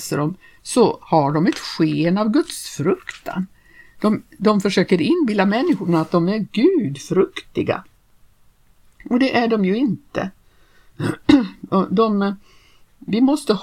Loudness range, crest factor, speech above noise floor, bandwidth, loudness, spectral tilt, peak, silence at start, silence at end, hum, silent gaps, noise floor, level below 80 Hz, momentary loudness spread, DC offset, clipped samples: 4 LU; 18 dB; 35 dB; 16 kHz; -19 LUFS; -6 dB/octave; 0 dBFS; 0 s; 0 s; none; none; -53 dBFS; -54 dBFS; 11 LU; under 0.1%; under 0.1%